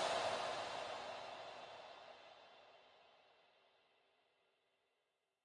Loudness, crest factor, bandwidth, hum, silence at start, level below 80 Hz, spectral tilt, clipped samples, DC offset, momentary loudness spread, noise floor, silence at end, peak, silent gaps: -46 LUFS; 22 dB; 11.5 kHz; none; 0 s; -86 dBFS; -2 dB/octave; under 0.1%; under 0.1%; 24 LU; -87 dBFS; 2.3 s; -28 dBFS; none